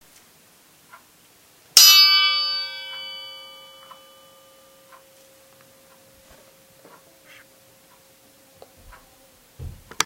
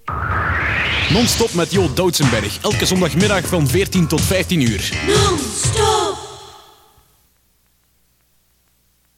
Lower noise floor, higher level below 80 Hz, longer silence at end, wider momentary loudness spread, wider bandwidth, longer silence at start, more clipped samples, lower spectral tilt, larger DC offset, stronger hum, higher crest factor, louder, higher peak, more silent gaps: second, -54 dBFS vs -60 dBFS; second, -56 dBFS vs -34 dBFS; second, 0 s vs 2.6 s; first, 32 LU vs 5 LU; about the same, 16 kHz vs 16.5 kHz; first, 1.75 s vs 0.05 s; neither; second, 2.5 dB/octave vs -4 dB/octave; neither; second, none vs 60 Hz at -40 dBFS; first, 24 dB vs 16 dB; first, -13 LUFS vs -16 LUFS; about the same, 0 dBFS vs -2 dBFS; neither